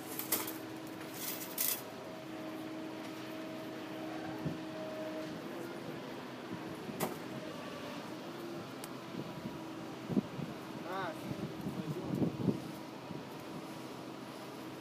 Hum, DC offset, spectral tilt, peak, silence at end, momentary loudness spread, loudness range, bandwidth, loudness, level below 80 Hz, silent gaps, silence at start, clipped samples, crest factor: none; under 0.1%; -4.5 dB/octave; -18 dBFS; 0 s; 10 LU; 4 LU; 15.5 kHz; -41 LUFS; -72 dBFS; none; 0 s; under 0.1%; 24 dB